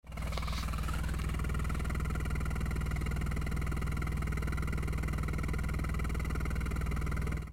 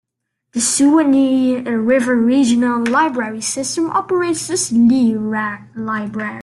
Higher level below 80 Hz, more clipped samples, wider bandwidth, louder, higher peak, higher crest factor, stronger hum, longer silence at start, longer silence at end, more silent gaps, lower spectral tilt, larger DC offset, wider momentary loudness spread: first, -36 dBFS vs -58 dBFS; neither; first, 16 kHz vs 12.5 kHz; second, -36 LUFS vs -16 LUFS; second, -22 dBFS vs -2 dBFS; about the same, 10 dB vs 12 dB; neither; second, 0.05 s vs 0.55 s; about the same, 0 s vs 0 s; neither; first, -6 dB/octave vs -3.5 dB/octave; neither; second, 1 LU vs 10 LU